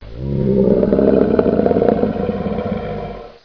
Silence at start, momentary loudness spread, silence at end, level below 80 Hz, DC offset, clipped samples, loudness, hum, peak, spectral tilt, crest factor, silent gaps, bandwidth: 0 s; 10 LU; 0.15 s; -34 dBFS; 0.2%; under 0.1%; -16 LUFS; none; 0 dBFS; -11 dB/octave; 16 dB; none; 5.4 kHz